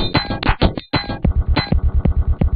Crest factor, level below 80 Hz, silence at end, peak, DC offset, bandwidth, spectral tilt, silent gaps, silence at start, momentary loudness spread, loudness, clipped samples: 16 dB; -20 dBFS; 0 s; -2 dBFS; under 0.1%; 5 kHz; -10 dB/octave; none; 0 s; 3 LU; -19 LUFS; under 0.1%